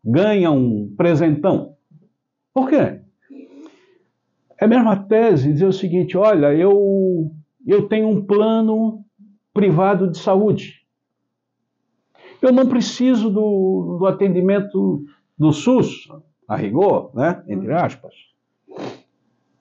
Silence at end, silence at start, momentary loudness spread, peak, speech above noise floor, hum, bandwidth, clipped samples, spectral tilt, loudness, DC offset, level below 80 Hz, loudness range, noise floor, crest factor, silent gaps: 0.65 s; 0.05 s; 11 LU; -6 dBFS; 60 dB; none; 7.6 kHz; under 0.1%; -8 dB/octave; -17 LUFS; under 0.1%; -60 dBFS; 5 LU; -76 dBFS; 12 dB; none